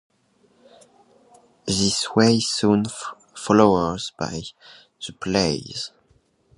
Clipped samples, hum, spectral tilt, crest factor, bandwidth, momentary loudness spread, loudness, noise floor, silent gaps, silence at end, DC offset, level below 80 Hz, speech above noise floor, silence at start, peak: under 0.1%; none; -4.5 dB/octave; 22 dB; 11.5 kHz; 18 LU; -21 LUFS; -62 dBFS; none; 0.7 s; under 0.1%; -50 dBFS; 41 dB; 1.65 s; 0 dBFS